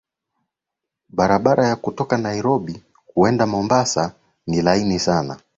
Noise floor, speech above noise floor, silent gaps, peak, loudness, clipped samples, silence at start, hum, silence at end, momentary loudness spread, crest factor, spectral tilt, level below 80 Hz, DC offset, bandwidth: -84 dBFS; 65 dB; none; -2 dBFS; -19 LUFS; under 0.1%; 1.15 s; none; 0.2 s; 10 LU; 18 dB; -5.5 dB/octave; -48 dBFS; under 0.1%; 8 kHz